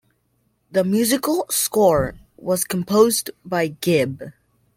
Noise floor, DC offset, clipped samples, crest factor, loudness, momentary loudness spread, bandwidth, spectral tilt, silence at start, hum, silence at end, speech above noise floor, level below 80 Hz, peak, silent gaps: -67 dBFS; under 0.1%; under 0.1%; 18 dB; -20 LUFS; 10 LU; 16.5 kHz; -4.5 dB/octave; 0.75 s; none; 0.45 s; 47 dB; -48 dBFS; -4 dBFS; none